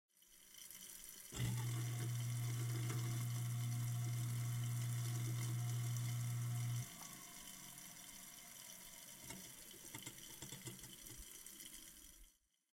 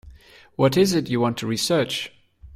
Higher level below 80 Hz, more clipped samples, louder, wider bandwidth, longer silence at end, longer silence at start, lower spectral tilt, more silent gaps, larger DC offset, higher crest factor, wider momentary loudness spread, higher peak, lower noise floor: second, -70 dBFS vs -52 dBFS; neither; second, -46 LUFS vs -22 LUFS; about the same, 16.5 kHz vs 16 kHz; first, 0.45 s vs 0.05 s; first, 0.3 s vs 0.05 s; about the same, -4.5 dB/octave vs -5 dB/octave; neither; neither; about the same, 14 dB vs 18 dB; about the same, 11 LU vs 12 LU; second, -30 dBFS vs -6 dBFS; first, -69 dBFS vs -47 dBFS